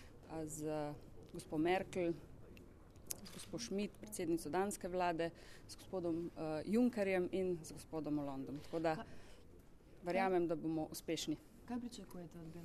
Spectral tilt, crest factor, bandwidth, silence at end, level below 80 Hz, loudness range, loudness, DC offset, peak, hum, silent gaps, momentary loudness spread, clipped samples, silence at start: -5 dB/octave; 26 dB; 14 kHz; 0 s; -64 dBFS; 3 LU; -41 LUFS; under 0.1%; -16 dBFS; none; none; 19 LU; under 0.1%; 0 s